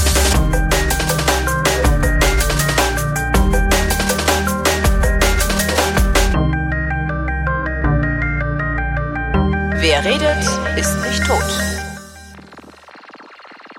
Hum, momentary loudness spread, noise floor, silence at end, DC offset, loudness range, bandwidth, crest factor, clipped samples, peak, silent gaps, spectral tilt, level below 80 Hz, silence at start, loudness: none; 5 LU; -40 dBFS; 0 s; under 0.1%; 3 LU; 16.5 kHz; 16 dB; under 0.1%; -2 dBFS; none; -4 dB/octave; -20 dBFS; 0 s; -16 LUFS